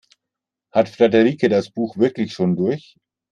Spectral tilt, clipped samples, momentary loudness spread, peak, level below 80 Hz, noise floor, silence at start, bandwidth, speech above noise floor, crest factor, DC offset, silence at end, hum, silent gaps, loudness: -7.5 dB/octave; under 0.1%; 8 LU; -2 dBFS; -62 dBFS; -84 dBFS; 0.75 s; 9.6 kHz; 66 dB; 18 dB; under 0.1%; 0.55 s; none; none; -19 LUFS